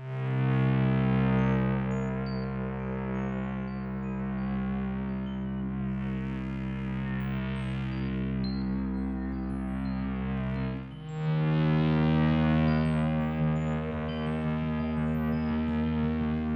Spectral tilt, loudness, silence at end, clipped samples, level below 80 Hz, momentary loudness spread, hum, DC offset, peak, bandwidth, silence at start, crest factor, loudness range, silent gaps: -9.5 dB/octave; -30 LUFS; 0 s; under 0.1%; -42 dBFS; 8 LU; none; under 0.1%; -16 dBFS; 7.2 kHz; 0 s; 14 dB; 6 LU; none